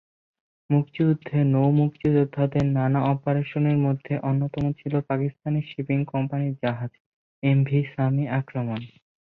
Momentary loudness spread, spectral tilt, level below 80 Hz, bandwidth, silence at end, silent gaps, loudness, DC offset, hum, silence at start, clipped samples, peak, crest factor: 7 LU; -10.5 dB/octave; -56 dBFS; 4.2 kHz; 0.5 s; 7.00-7.42 s; -24 LUFS; under 0.1%; none; 0.7 s; under 0.1%; -8 dBFS; 16 dB